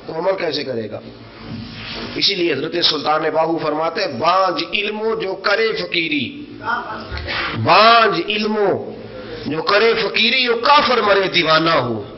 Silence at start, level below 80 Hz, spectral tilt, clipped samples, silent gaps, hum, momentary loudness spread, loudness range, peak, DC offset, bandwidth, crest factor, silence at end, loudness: 0 s; -46 dBFS; -5 dB/octave; under 0.1%; none; none; 16 LU; 5 LU; 0 dBFS; under 0.1%; 6.4 kHz; 16 dB; 0 s; -16 LUFS